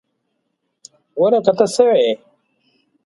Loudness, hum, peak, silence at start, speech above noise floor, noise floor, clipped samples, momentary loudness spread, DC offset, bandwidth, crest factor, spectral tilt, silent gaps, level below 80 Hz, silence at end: -15 LUFS; none; 0 dBFS; 1.15 s; 58 dB; -72 dBFS; under 0.1%; 12 LU; under 0.1%; 11.5 kHz; 18 dB; -4.5 dB/octave; none; -66 dBFS; 0.9 s